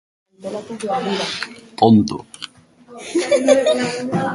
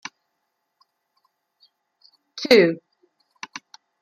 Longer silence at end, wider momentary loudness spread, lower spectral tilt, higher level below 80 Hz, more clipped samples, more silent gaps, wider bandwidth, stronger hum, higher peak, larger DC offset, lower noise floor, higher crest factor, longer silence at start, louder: second, 0 s vs 1.25 s; second, 20 LU vs 25 LU; about the same, -5 dB/octave vs -4.5 dB/octave; first, -56 dBFS vs -72 dBFS; neither; neither; second, 11.5 kHz vs 14.5 kHz; neither; about the same, 0 dBFS vs -2 dBFS; neither; second, -45 dBFS vs -76 dBFS; about the same, 20 dB vs 24 dB; second, 0.4 s vs 2.35 s; about the same, -18 LUFS vs -18 LUFS